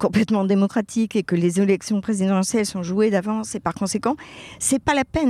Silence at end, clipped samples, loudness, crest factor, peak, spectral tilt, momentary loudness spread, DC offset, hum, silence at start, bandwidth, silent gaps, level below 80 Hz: 0 s; under 0.1%; -21 LUFS; 16 dB; -4 dBFS; -5.5 dB/octave; 6 LU; under 0.1%; none; 0 s; 14.5 kHz; none; -48 dBFS